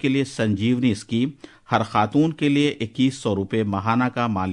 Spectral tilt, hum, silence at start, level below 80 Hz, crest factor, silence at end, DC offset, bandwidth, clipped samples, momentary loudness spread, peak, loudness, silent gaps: -6.5 dB/octave; none; 0.05 s; -60 dBFS; 16 dB; 0 s; under 0.1%; 11 kHz; under 0.1%; 5 LU; -4 dBFS; -22 LUFS; none